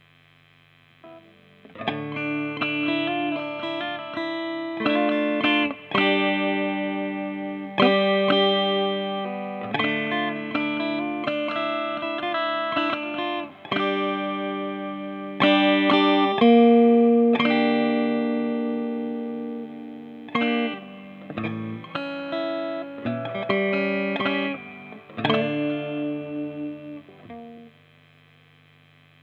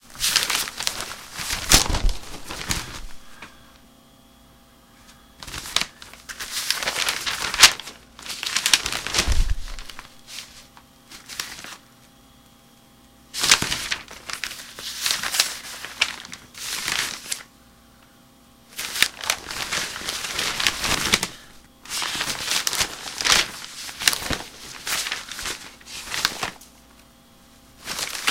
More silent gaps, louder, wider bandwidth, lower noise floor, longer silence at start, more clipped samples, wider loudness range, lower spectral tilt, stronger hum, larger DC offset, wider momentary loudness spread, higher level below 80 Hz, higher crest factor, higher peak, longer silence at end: neither; about the same, -23 LUFS vs -23 LUFS; second, 5.8 kHz vs 17 kHz; first, -56 dBFS vs -52 dBFS; first, 1.05 s vs 0.05 s; neither; second, 10 LU vs 13 LU; first, -7.5 dB/octave vs -0.5 dB/octave; first, 50 Hz at -60 dBFS vs none; neither; second, 15 LU vs 20 LU; second, -72 dBFS vs -36 dBFS; second, 20 dB vs 26 dB; second, -4 dBFS vs 0 dBFS; first, 1.55 s vs 0 s